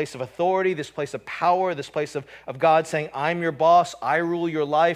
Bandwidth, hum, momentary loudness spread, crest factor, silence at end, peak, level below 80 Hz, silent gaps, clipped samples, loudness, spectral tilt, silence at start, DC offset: 13.5 kHz; none; 12 LU; 16 dB; 0 s; -6 dBFS; -66 dBFS; none; under 0.1%; -23 LUFS; -5.5 dB/octave; 0 s; under 0.1%